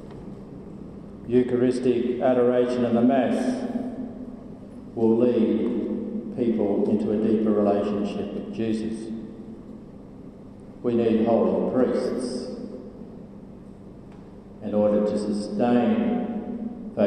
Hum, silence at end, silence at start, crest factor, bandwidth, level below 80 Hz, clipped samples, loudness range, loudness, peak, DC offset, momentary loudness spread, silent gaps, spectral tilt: 50 Hz at -45 dBFS; 0 s; 0 s; 16 dB; 10 kHz; -54 dBFS; under 0.1%; 6 LU; -24 LUFS; -8 dBFS; under 0.1%; 22 LU; none; -7.5 dB/octave